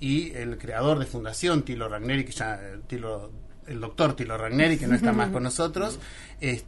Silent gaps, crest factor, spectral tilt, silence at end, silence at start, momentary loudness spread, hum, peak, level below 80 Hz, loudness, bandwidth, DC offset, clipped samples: none; 18 dB; -5.5 dB/octave; 0 s; 0 s; 15 LU; none; -8 dBFS; -42 dBFS; -27 LUFS; 11.5 kHz; under 0.1%; under 0.1%